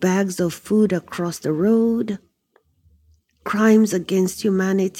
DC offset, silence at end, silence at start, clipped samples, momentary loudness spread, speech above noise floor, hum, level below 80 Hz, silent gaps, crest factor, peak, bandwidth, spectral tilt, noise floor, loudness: under 0.1%; 0 s; 0 s; under 0.1%; 11 LU; 44 dB; none; -58 dBFS; none; 16 dB; -4 dBFS; 16 kHz; -6 dB/octave; -63 dBFS; -20 LUFS